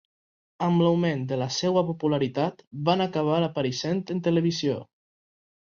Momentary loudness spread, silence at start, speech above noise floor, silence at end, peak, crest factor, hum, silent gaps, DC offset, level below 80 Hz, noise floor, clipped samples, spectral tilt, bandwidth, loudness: 7 LU; 0.6 s; over 65 dB; 0.9 s; -8 dBFS; 18 dB; none; 2.67-2.71 s; under 0.1%; -66 dBFS; under -90 dBFS; under 0.1%; -6 dB/octave; 7.2 kHz; -26 LUFS